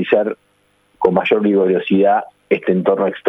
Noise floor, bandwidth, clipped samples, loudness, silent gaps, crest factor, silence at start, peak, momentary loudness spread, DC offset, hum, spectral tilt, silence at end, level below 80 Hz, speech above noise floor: -39 dBFS; 4 kHz; under 0.1%; -16 LUFS; none; 16 dB; 0 s; 0 dBFS; 6 LU; under 0.1%; none; -9 dB/octave; 0 s; -60 dBFS; 24 dB